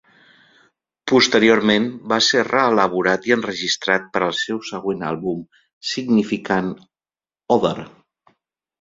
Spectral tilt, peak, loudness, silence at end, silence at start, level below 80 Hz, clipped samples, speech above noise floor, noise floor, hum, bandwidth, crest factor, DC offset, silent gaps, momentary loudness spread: -4 dB/octave; 0 dBFS; -19 LUFS; 0.95 s; 1.05 s; -58 dBFS; under 0.1%; over 71 dB; under -90 dBFS; none; 7.8 kHz; 20 dB; under 0.1%; 5.73-5.81 s; 12 LU